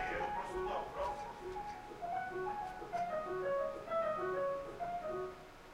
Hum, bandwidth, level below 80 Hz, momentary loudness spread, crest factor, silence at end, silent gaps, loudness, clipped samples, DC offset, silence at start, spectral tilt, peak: none; 16 kHz; -60 dBFS; 8 LU; 14 dB; 0 s; none; -41 LUFS; under 0.1%; under 0.1%; 0 s; -5.5 dB/octave; -28 dBFS